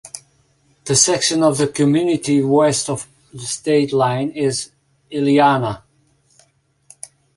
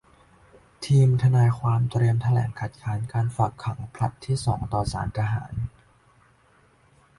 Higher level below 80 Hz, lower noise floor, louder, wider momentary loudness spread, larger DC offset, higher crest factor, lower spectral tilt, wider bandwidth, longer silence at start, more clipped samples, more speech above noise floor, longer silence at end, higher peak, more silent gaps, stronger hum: second, -56 dBFS vs -46 dBFS; about the same, -60 dBFS vs -59 dBFS; first, -17 LUFS vs -24 LUFS; first, 21 LU vs 13 LU; neither; about the same, 18 dB vs 16 dB; second, -4 dB/octave vs -7.5 dB/octave; about the same, 11.5 kHz vs 11.5 kHz; second, 0.05 s vs 0.8 s; neither; first, 43 dB vs 37 dB; second, 0.3 s vs 1.5 s; first, -2 dBFS vs -8 dBFS; neither; neither